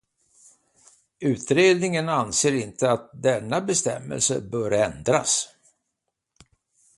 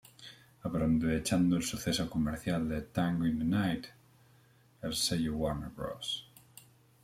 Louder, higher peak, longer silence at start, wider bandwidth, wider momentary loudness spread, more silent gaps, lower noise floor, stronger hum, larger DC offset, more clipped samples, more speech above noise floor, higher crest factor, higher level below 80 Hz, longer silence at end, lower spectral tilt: first, -23 LUFS vs -33 LUFS; first, -6 dBFS vs -18 dBFS; first, 1.2 s vs 0.2 s; second, 11.5 kHz vs 16 kHz; second, 8 LU vs 14 LU; neither; first, -80 dBFS vs -64 dBFS; neither; neither; neither; first, 58 dB vs 32 dB; about the same, 20 dB vs 16 dB; second, -58 dBFS vs -52 dBFS; first, 1.5 s vs 0.8 s; second, -3.5 dB/octave vs -5 dB/octave